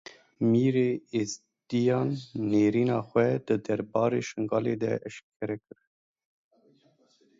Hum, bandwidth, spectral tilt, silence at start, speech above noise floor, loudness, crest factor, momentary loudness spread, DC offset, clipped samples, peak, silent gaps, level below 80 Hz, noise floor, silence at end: none; 7.8 kHz; -7 dB/octave; 0.4 s; 38 dB; -28 LUFS; 18 dB; 12 LU; under 0.1%; under 0.1%; -10 dBFS; 5.23-5.40 s; -68 dBFS; -65 dBFS; 1.8 s